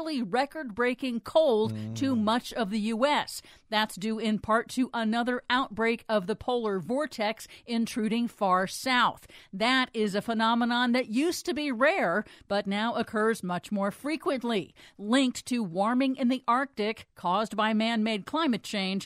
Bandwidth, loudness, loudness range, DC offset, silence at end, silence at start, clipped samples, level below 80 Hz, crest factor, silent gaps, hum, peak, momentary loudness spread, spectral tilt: 15.5 kHz; -28 LUFS; 3 LU; under 0.1%; 0 s; 0 s; under 0.1%; -64 dBFS; 18 dB; none; none; -10 dBFS; 7 LU; -4.5 dB/octave